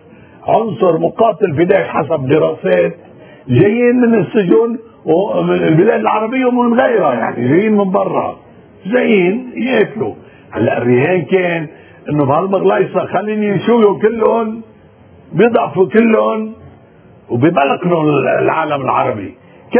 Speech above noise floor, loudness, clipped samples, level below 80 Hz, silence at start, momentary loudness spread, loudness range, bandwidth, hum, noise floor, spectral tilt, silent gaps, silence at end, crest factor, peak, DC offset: 30 dB; -13 LUFS; under 0.1%; -52 dBFS; 0.45 s; 9 LU; 3 LU; 4 kHz; none; -42 dBFS; -11 dB/octave; none; 0 s; 14 dB; 0 dBFS; under 0.1%